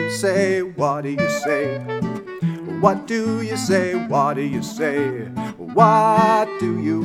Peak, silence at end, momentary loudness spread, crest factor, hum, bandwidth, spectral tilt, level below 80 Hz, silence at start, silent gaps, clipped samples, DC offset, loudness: 0 dBFS; 0 s; 11 LU; 20 dB; none; 16 kHz; -6 dB/octave; -60 dBFS; 0 s; none; under 0.1%; under 0.1%; -20 LUFS